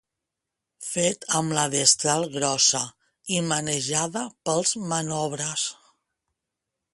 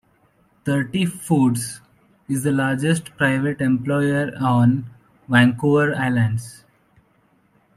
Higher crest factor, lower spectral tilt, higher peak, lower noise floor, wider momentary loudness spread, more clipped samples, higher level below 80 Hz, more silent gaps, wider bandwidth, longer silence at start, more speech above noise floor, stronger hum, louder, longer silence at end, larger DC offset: about the same, 22 dB vs 18 dB; second, -2.5 dB/octave vs -6 dB/octave; about the same, -4 dBFS vs -2 dBFS; first, -85 dBFS vs -60 dBFS; about the same, 11 LU vs 11 LU; neither; second, -64 dBFS vs -58 dBFS; neither; second, 12 kHz vs 14.5 kHz; first, 0.8 s vs 0.65 s; first, 60 dB vs 41 dB; neither; second, -23 LUFS vs -20 LUFS; about the same, 1.2 s vs 1.2 s; neither